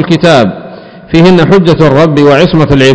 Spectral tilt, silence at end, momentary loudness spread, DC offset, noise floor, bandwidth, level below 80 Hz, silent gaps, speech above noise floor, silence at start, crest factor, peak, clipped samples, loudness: -7 dB/octave; 0 s; 6 LU; under 0.1%; -27 dBFS; 8 kHz; -30 dBFS; none; 23 dB; 0 s; 6 dB; 0 dBFS; 20%; -5 LUFS